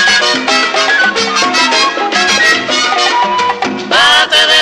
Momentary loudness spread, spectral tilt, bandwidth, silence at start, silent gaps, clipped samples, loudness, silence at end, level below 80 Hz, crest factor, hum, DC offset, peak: 5 LU; -0.5 dB/octave; 16 kHz; 0 s; none; under 0.1%; -9 LUFS; 0 s; -50 dBFS; 10 dB; none; under 0.1%; 0 dBFS